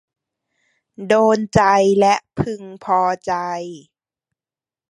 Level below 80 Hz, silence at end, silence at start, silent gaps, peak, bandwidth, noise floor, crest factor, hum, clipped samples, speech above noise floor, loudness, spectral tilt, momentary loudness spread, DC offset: -48 dBFS; 1.15 s; 1 s; none; -2 dBFS; 11 kHz; under -90 dBFS; 18 dB; none; under 0.1%; over 73 dB; -17 LUFS; -5.5 dB/octave; 15 LU; under 0.1%